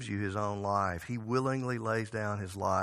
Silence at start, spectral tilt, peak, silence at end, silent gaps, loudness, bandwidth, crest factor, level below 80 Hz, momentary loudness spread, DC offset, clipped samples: 0 s; -6.5 dB/octave; -16 dBFS; 0 s; none; -33 LUFS; 14 kHz; 18 dB; -62 dBFS; 4 LU; under 0.1%; under 0.1%